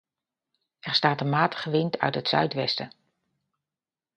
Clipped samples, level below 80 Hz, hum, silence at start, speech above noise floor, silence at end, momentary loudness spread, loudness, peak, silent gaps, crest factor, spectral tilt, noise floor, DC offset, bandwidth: under 0.1%; -72 dBFS; none; 0.85 s; over 65 dB; 1.3 s; 7 LU; -25 LUFS; -4 dBFS; none; 24 dB; -6 dB/octave; under -90 dBFS; under 0.1%; 9.4 kHz